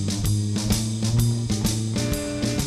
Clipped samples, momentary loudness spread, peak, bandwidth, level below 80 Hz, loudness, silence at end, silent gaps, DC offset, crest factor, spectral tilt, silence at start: under 0.1%; 3 LU; -8 dBFS; 15.5 kHz; -36 dBFS; -24 LUFS; 0 s; none; under 0.1%; 16 dB; -5 dB/octave; 0 s